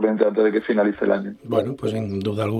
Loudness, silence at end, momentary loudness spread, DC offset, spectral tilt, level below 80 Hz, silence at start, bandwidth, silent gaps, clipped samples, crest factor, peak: -22 LUFS; 0 s; 7 LU; under 0.1%; -8 dB/octave; -62 dBFS; 0 s; 13 kHz; none; under 0.1%; 18 dB; -4 dBFS